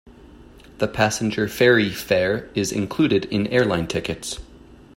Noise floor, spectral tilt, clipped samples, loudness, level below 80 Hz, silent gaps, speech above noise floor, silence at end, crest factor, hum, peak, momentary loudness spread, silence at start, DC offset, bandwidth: -46 dBFS; -4.5 dB/octave; under 0.1%; -21 LUFS; -48 dBFS; none; 25 dB; 0.2 s; 18 dB; none; -4 dBFS; 11 LU; 0.05 s; under 0.1%; 16.5 kHz